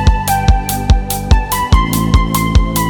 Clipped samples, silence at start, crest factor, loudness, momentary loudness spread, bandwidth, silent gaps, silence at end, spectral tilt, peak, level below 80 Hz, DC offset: under 0.1%; 0 s; 12 dB; -14 LUFS; 2 LU; over 20 kHz; none; 0 s; -5 dB/octave; 0 dBFS; -14 dBFS; under 0.1%